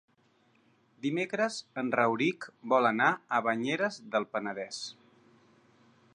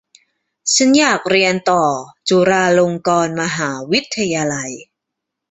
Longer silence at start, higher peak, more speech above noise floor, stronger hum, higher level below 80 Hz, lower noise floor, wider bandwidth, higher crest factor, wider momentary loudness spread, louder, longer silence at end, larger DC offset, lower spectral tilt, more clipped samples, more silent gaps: first, 1.05 s vs 0.65 s; second, -12 dBFS vs -2 dBFS; second, 38 dB vs 64 dB; neither; second, -82 dBFS vs -56 dBFS; second, -68 dBFS vs -80 dBFS; first, 11 kHz vs 8.4 kHz; about the same, 20 dB vs 16 dB; about the same, 11 LU vs 10 LU; second, -30 LUFS vs -15 LUFS; first, 1.2 s vs 0.65 s; neither; about the same, -4.5 dB/octave vs -3.5 dB/octave; neither; neither